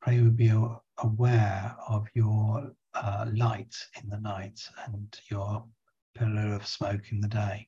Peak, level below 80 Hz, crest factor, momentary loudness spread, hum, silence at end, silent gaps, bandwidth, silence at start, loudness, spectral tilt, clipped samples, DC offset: -12 dBFS; -54 dBFS; 16 dB; 15 LU; none; 0.05 s; 6.02-6.14 s; 7.4 kHz; 0 s; -29 LUFS; -7.5 dB/octave; under 0.1%; under 0.1%